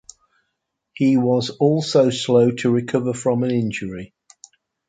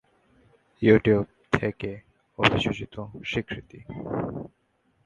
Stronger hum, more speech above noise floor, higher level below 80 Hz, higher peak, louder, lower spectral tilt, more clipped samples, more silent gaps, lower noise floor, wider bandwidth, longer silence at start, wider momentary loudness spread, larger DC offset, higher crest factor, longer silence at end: neither; first, 58 dB vs 44 dB; second, -58 dBFS vs -50 dBFS; about the same, -4 dBFS vs -4 dBFS; first, -19 LUFS vs -25 LUFS; about the same, -6 dB/octave vs -6.5 dB/octave; neither; neither; first, -77 dBFS vs -69 dBFS; about the same, 9.4 kHz vs 9.4 kHz; first, 0.95 s vs 0.8 s; second, 8 LU vs 20 LU; neither; second, 16 dB vs 24 dB; first, 0.85 s vs 0.6 s